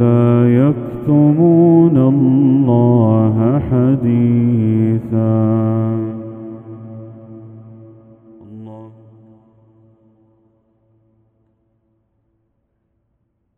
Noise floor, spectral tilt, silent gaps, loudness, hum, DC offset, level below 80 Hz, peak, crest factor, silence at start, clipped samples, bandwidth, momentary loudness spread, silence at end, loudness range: -66 dBFS; -12.5 dB/octave; none; -13 LUFS; none; under 0.1%; -48 dBFS; 0 dBFS; 14 dB; 0 s; under 0.1%; 3.5 kHz; 23 LU; 4.7 s; 17 LU